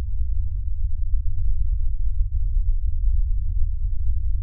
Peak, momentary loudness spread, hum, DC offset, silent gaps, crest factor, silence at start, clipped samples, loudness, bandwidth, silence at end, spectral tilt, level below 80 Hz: -8 dBFS; 3 LU; none; under 0.1%; none; 12 dB; 0 s; under 0.1%; -28 LUFS; 0.2 kHz; 0 s; -25.5 dB/octave; -20 dBFS